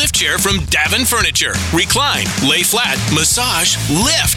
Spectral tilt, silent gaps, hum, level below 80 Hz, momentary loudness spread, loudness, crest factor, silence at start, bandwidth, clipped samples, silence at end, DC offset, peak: -2 dB/octave; none; none; -32 dBFS; 3 LU; -13 LUFS; 12 dB; 0 s; 17 kHz; under 0.1%; 0 s; under 0.1%; -2 dBFS